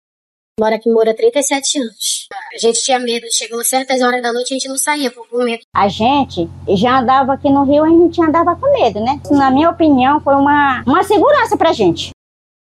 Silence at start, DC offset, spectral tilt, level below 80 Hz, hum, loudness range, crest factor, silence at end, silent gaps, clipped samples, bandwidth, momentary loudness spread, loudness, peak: 0.6 s; under 0.1%; -3.5 dB/octave; -52 dBFS; none; 4 LU; 12 dB; 0.5 s; 5.64-5.72 s; under 0.1%; 13 kHz; 8 LU; -13 LUFS; -2 dBFS